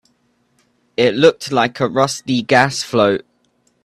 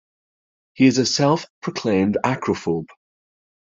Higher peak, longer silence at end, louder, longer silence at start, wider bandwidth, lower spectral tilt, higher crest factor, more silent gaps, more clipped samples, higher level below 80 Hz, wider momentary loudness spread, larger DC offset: first, 0 dBFS vs -4 dBFS; about the same, 0.65 s vs 0.75 s; first, -16 LUFS vs -20 LUFS; first, 1 s vs 0.8 s; first, 13.5 kHz vs 7.6 kHz; about the same, -4.5 dB/octave vs -5 dB/octave; about the same, 18 dB vs 18 dB; second, none vs 1.50-1.62 s; neither; about the same, -58 dBFS vs -60 dBFS; second, 6 LU vs 9 LU; neither